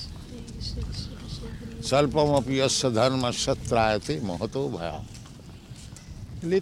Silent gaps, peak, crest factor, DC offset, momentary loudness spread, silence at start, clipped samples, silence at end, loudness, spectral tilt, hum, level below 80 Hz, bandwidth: none; -8 dBFS; 20 dB; under 0.1%; 20 LU; 0 s; under 0.1%; 0 s; -26 LUFS; -4.5 dB/octave; none; -42 dBFS; 16 kHz